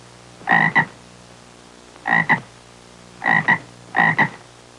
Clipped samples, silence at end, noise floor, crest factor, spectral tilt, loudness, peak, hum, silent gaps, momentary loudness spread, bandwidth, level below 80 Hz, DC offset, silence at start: under 0.1%; 0.4 s; -45 dBFS; 18 dB; -5 dB/octave; -18 LUFS; -4 dBFS; 60 Hz at -50 dBFS; none; 10 LU; 11.5 kHz; -60 dBFS; under 0.1%; 0.4 s